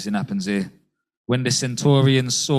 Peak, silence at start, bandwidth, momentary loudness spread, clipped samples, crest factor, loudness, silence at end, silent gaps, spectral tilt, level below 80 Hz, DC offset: -6 dBFS; 0 s; 14 kHz; 9 LU; under 0.1%; 16 dB; -20 LUFS; 0 s; 1.17-1.25 s; -4.5 dB/octave; -58 dBFS; under 0.1%